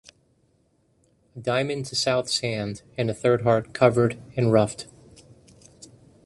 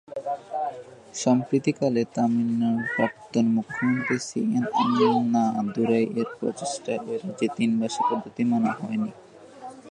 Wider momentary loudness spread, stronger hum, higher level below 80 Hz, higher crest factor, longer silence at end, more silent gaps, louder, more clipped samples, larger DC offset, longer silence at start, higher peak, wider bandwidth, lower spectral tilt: about the same, 11 LU vs 10 LU; neither; first, -58 dBFS vs -70 dBFS; about the same, 22 dB vs 18 dB; first, 0.4 s vs 0 s; neither; about the same, -24 LUFS vs -25 LUFS; neither; neither; first, 1.35 s vs 0.1 s; first, -4 dBFS vs -8 dBFS; first, 11.5 kHz vs 9.8 kHz; about the same, -5 dB/octave vs -5.5 dB/octave